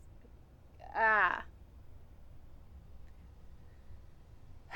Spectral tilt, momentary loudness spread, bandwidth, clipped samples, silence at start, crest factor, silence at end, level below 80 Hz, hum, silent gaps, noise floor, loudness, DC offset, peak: -5.5 dB/octave; 30 LU; 17.5 kHz; under 0.1%; 0.2 s; 24 dB; 0 s; -56 dBFS; none; none; -57 dBFS; -31 LUFS; under 0.1%; -16 dBFS